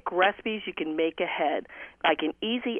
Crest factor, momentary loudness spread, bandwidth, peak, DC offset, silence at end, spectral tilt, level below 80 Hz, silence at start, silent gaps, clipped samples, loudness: 18 dB; 7 LU; 3.8 kHz; -10 dBFS; under 0.1%; 0 s; -6.5 dB/octave; -66 dBFS; 0.05 s; none; under 0.1%; -28 LUFS